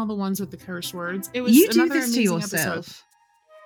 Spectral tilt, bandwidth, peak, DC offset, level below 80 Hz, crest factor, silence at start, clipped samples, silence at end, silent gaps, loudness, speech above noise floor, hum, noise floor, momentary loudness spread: -4 dB/octave; over 20 kHz; -4 dBFS; under 0.1%; -66 dBFS; 20 dB; 0 s; under 0.1%; 0.65 s; none; -22 LUFS; 33 dB; none; -55 dBFS; 16 LU